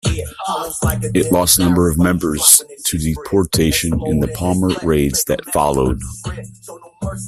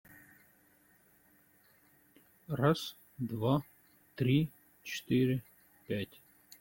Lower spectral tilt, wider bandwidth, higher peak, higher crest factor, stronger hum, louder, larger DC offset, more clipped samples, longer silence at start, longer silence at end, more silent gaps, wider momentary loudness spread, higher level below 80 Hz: second, -4 dB/octave vs -7 dB/octave; about the same, 16 kHz vs 17 kHz; first, 0 dBFS vs -16 dBFS; about the same, 16 dB vs 20 dB; neither; first, -15 LUFS vs -34 LUFS; neither; neither; second, 0.05 s vs 2.5 s; second, 0 s vs 0.55 s; neither; about the same, 15 LU vs 14 LU; first, -32 dBFS vs -66 dBFS